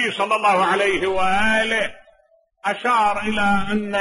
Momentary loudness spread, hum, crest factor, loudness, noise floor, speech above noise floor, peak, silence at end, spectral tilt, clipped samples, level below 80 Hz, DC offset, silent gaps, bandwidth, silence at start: 6 LU; none; 14 dB; -19 LUFS; -59 dBFS; 40 dB; -6 dBFS; 0 s; -4 dB/octave; under 0.1%; -44 dBFS; under 0.1%; none; 11.5 kHz; 0 s